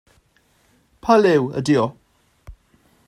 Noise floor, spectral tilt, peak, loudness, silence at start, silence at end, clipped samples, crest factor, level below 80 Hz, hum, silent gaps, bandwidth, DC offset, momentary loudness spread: -61 dBFS; -6.5 dB/octave; -2 dBFS; -18 LUFS; 1.05 s; 0.55 s; under 0.1%; 18 dB; -52 dBFS; none; none; 14.5 kHz; under 0.1%; 11 LU